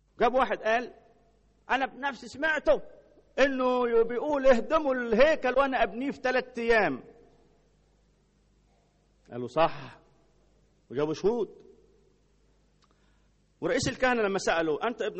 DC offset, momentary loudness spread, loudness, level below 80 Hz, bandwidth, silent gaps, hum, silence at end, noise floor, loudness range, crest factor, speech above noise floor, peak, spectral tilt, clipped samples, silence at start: under 0.1%; 12 LU; -27 LUFS; -52 dBFS; 8.2 kHz; none; 50 Hz at -65 dBFS; 0 s; -66 dBFS; 10 LU; 20 dB; 39 dB; -8 dBFS; -4.5 dB/octave; under 0.1%; 0.2 s